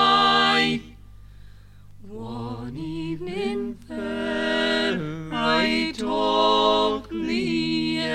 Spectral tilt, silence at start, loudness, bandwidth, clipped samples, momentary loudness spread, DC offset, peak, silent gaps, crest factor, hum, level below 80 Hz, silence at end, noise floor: -4.5 dB/octave; 0 s; -23 LUFS; 12.5 kHz; under 0.1%; 15 LU; under 0.1%; -6 dBFS; none; 18 dB; 50 Hz at -50 dBFS; -48 dBFS; 0 s; -45 dBFS